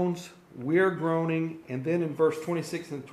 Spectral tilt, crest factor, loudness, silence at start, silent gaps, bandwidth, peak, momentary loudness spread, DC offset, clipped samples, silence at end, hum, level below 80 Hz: -7 dB/octave; 16 dB; -29 LUFS; 0 s; none; 14.5 kHz; -12 dBFS; 12 LU; under 0.1%; under 0.1%; 0 s; none; -72 dBFS